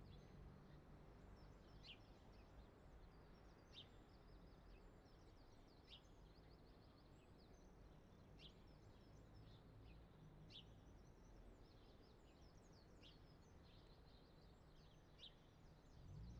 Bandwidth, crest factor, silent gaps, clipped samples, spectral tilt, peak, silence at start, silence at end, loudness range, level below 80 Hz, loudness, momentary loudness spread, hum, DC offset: 8 kHz; 16 dB; none; under 0.1%; -4.5 dB/octave; -48 dBFS; 0 s; 0 s; 3 LU; -70 dBFS; -67 LUFS; 6 LU; none; under 0.1%